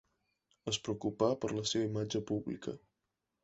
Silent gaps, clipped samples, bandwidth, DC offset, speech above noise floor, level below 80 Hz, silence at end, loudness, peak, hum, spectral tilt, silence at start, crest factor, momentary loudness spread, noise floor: none; under 0.1%; 8 kHz; under 0.1%; 51 dB; -66 dBFS; 0.65 s; -36 LUFS; -16 dBFS; none; -5 dB/octave; 0.65 s; 20 dB; 11 LU; -87 dBFS